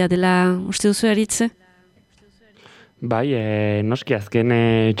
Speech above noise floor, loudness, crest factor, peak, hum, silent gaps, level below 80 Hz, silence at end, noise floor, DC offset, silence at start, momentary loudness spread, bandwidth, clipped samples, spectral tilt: 37 dB; -19 LUFS; 16 dB; -4 dBFS; none; none; -54 dBFS; 0 s; -56 dBFS; under 0.1%; 0 s; 6 LU; 14 kHz; under 0.1%; -5.5 dB/octave